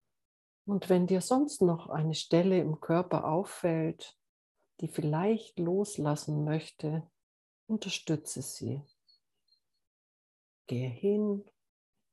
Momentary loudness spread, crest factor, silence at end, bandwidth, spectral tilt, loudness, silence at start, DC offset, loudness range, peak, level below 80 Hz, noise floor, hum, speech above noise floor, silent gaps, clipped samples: 11 LU; 20 dB; 0.7 s; 12.5 kHz; -6.5 dB/octave; -32 LUFS; 0.65 s; under 0.1%; 10 LU; -14 dBFS; -74 dBFS; -75 dBFS; none; 45 dB; 4.29-4.55 s, 7.23-7.67 s, 9.87-10.65 s; under 0.1%